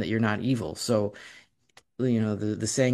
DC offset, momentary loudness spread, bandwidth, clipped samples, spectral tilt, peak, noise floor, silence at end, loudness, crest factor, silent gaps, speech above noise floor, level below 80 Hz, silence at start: under 0.1%; 18 LU; 13 kHz; under 0.1%; -5.5 dB/octave; -10 dBFS; -61 dBFS; 0 s; -27 LUFS; 18 dB; none; 35 dB; -60 dBFS; 0 s